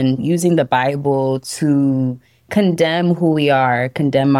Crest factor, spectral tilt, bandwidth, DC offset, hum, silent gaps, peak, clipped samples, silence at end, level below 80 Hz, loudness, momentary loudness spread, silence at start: 12 dB; -6.5 dB/octave; 15 kHz; under 0.1%; none; none; -4 dBFS; under 0.1%; 0 s; -56 dBFS; -16 LUFS; 6 LU; 0 s